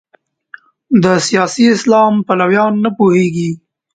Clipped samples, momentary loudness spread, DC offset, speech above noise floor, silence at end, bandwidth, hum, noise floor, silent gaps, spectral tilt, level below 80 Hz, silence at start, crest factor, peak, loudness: under 0.1%; 6 LU; under 0.1%; 29 dB; 0.4 s; 9.4 kHz; none; -40 dBFS; none; -5.5 dB/octave; -56 dBFS; 0.9 s; 12 dB; 0 dBFS; -12 LUFS